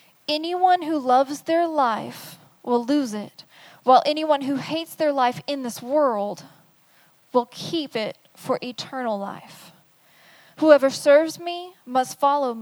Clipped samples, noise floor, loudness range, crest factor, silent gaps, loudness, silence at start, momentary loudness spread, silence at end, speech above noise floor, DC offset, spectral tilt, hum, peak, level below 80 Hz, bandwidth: under 0.1%; -58 dBFS; 7 LU; 22 dB; none; -22 LUFS; 0.3 s; 16 LU; 0 s; 36 dB; under 0.1%; -4 dB/octave; none; -2 dBFS; -78 dBFS; over 20 kHz